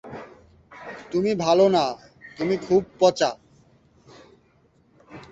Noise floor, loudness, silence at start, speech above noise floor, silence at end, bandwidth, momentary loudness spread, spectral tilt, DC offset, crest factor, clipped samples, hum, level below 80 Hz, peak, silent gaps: -61 dBFS; -22 LUFS; 0.05 s; 40 dB; 0.05 s; 8 kHz; 23 LU; -5.5 dB/octave; under 0.1%; 20 dB; under 0.1%; none; -60 dBFS; -6 dBFS; none